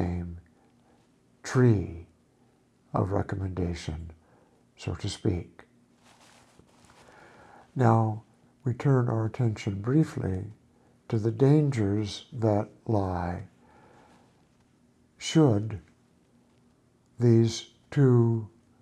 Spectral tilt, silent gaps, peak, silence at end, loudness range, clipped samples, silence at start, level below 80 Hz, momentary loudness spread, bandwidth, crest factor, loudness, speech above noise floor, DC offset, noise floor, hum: -7.5 dB/octave; none; -10 dBFS; 0.35 s; 8 LU; under 0.1%; 0 s; -54 dBFS; 18 LU; 9.8 kHz; 20 dB; -27 LUFS; 39 dB; under 0.1%; -64 dBFS; none